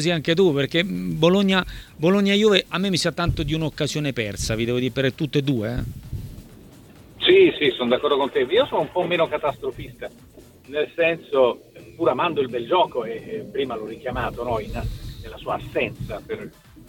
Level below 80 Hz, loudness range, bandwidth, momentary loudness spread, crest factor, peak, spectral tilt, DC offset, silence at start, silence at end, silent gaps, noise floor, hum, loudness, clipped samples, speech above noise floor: -42 dBFS; 6 LU; 18 kHz; 16 LU; 22 dB; 0 dBFS; -5.5 dB/octave; under 0.1%; 0 s; 0.05 s; none; -46 dBFS; none; -22 LUFS; under 0.1%; 24 dB